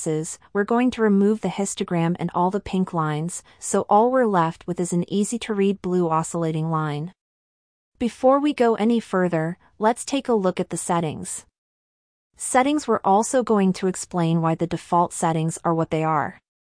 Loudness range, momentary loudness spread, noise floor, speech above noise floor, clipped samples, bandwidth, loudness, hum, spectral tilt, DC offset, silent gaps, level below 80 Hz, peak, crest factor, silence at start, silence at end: 3 LU; 9 LU; under -90 dBFS; over 68 dB; under 0.1%; 10.5 kHz; -22 LUFS; none; -5.5 dB/octave; under 0.1%; 7.21-7.92 s, 11.58-12.30 s; -58 dBFS; -6 dBFS; 16 dB; 0 s; 0.3 s